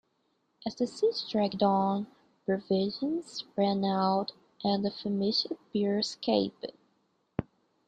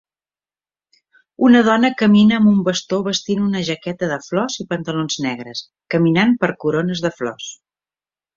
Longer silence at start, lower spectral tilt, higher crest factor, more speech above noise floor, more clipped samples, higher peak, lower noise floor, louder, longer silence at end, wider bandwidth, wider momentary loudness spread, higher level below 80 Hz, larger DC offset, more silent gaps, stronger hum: second, 0.65 s vs 1.4 s; about the same, -6 dB/octave vs -5.5 dB/octave; about the same, 18 dB vs 16 dB; second, 45 dB vs over 73 dB; neither; second, -12 dBFS vs -2 dBFS; second, -75 dBFS vs under -90 dBFS; second, -31 LUFS vs -17 LUFS; second, 0.45 s vs 0.85 s; first, 9.2 kHz vs 7.6 kHz; about the same, 12 LU vs 13 LU; second, -66 dBFS vs -58 dBFS; neither; neither; neither